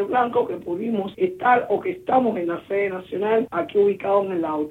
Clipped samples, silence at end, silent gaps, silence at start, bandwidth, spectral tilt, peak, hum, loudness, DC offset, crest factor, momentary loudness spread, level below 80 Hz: under 0.1%; 0 s; none; 0 s; 4.2 kHz; -8 dB/octave; -6 dBFS; none; -22 LUFS; under 0.1%; 16 dB; 7 LU; -62 dBFS